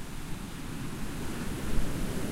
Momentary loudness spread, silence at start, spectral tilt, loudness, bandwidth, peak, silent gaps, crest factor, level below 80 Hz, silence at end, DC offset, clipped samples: 6 LU; 0 s; -5 dB/octave; -37 LUFS; 16 kHz; -14 dBFS; none; 18 dB; -38 dBFS; 0 s; under 0.1%; under 0.1%